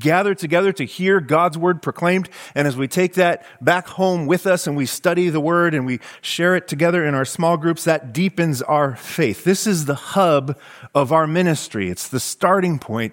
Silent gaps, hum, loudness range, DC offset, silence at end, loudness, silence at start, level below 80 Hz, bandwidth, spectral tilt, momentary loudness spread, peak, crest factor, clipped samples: none; none; 1 LU; under 0.1%; 0 s; -19 LUFS; 0 s; -62 dBFS; 17 kHz; -5 dB/octave; 6 LU; -2 dBFS; 18 dB; under 0.1%